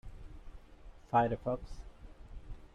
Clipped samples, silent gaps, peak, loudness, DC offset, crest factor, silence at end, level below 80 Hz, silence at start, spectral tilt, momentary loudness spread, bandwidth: under 0.1%; none; -16 dBFS; -34 LUFS; under 0.1%; 22 dB; 0.1 s; -50 dBFS; 0.05 s; -8 dB/octave; 25 LU; 10.5 kHz